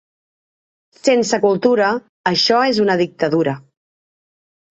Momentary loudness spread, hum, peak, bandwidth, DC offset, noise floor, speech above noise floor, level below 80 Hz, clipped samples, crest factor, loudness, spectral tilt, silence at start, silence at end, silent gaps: 7 LU; none; -2 dBFS; 8.4 kHz; under 0.1%; under -90 dBFS; over 74 dB; -62 dBFS; under 0.1%; 16 dB; -16 LUFS; -4.5 dB/octave; 1.05 s; 1.1 s; 2.09-2.24 s